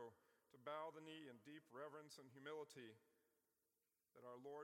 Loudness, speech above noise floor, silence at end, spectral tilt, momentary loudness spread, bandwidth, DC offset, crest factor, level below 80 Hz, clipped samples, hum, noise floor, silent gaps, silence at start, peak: -58 LUFS; over 31 dB; 0 s; -4.5 dB/octave; 10 LU; 16.5 kHz; under 0.1%; 20 dB; under -90 dBFS; under 0.1%; none; under -90 dBFS; none; 0 s; -38 dBFS